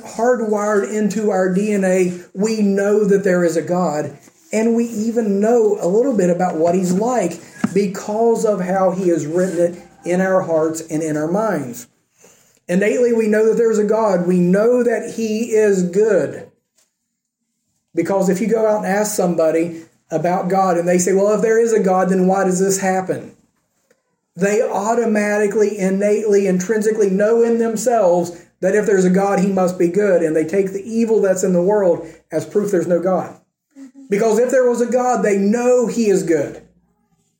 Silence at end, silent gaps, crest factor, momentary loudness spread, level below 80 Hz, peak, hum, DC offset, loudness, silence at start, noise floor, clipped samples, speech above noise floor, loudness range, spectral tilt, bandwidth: 0.8 s; none; 14 dB; 7 LU; -64 dBFS; -4 dBFS; none; under 0.1%; -17 LUFS; 0.05 s; -75 dBFS; under 0.1%; 59 dB; 3 LU; -6 dB/octave; 17 kHz